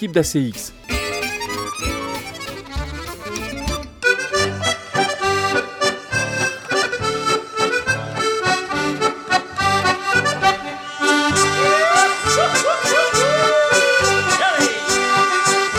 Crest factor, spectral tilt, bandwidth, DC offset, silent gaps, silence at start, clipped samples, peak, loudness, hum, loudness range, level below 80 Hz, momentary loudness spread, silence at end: 18 dB; -2.5 dB/octave; 19 kHz; under 0.1%; none; 0 s; under 0.1%; -2 dBFS; -18 LUFS; none; 9 LU; -40 dBFS; 11 LU; 0 s